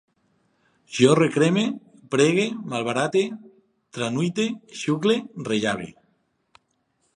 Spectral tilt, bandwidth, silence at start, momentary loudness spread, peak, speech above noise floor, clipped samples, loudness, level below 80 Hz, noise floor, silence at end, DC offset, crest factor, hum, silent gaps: -5 dB/octave; 11 kHz; 0.9 s; 13 LU; -2 dBFS; 48 dB; under 0.1%; -23 LUFS; -68 dBFS; -70 dBFS; 1.25 s; under 0.1%; 22 dB; none; none